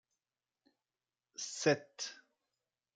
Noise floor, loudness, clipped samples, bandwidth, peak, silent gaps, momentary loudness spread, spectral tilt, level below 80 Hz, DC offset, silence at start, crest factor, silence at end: under -90 dBFS; -37 LUFS; under 0.1%; 9.6 kHz; -16 dBFS; none; 12 LU; -3.5 dB/octave; -86 dBFS; under 0.1%; 1.4 s; 26 dB; 0.8 s